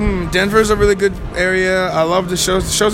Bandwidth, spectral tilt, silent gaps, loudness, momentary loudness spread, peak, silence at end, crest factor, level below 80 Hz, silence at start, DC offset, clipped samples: 16.5 kHz; -4 dB/octave; none; -15 LUFS; 4 LU; 0 dBFS; 0 s; 14 dB; -28 dBFS; 0 s; under 0.1%; under 0.1%